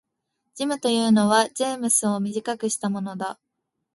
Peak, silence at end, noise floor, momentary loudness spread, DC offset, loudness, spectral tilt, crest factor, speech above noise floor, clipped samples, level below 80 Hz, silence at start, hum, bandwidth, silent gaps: -4 dBFS; 0.65 s; -79 dBFS; 12 LU; under 0.1%; -23 LUFS; -3.5 dB/octave; 20 dB; 57 dB; under 0.1%; -70 dBFS; 0.55 s; none; 12 kHz; none